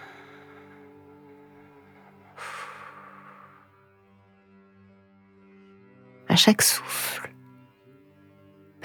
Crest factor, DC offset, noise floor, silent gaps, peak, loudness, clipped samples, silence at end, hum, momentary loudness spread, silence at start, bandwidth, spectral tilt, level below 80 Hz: 28 dB; under 0.1%; -58 dBFS; none; -2 dBFS; -22 LUFS; under 0.1%; 1.55 s; none; 31 LU; 0 s; over 20 kHz; -2.5 dB/octave; -74 dBFS